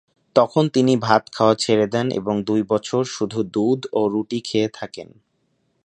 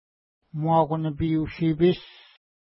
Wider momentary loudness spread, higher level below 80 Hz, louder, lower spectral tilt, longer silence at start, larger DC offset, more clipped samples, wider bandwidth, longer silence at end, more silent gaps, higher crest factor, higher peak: about the same, 7 LU vs 9 LU; second, -60 dBFS vs -48 dBFS; first, -20 LUFS vs -24 LUFS; second, -5.5 dB/octave vs -12 dB/octave; second, 0.35 s vs 0.55 s; neither; neither; first, 10.5 kHz vs 5.8 kHz; first, 0.8 s vs 0.65 s; neither; about the same, 20 dB vs 16 dB; first, 0 dBFS vs -10 dBFS